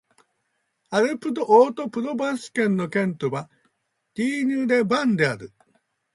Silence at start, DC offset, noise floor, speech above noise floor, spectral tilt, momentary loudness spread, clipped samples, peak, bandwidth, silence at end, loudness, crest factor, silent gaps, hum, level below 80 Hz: 0.9 s; under 0.1%; -74 dBFS; 52 dB; -6 dB/octave; 11 LU; under 0.1%; -4 dBFS; 11.5 kHz; 0.65 s; -22 LUFS; 20 dB; none; none; -68 dBFS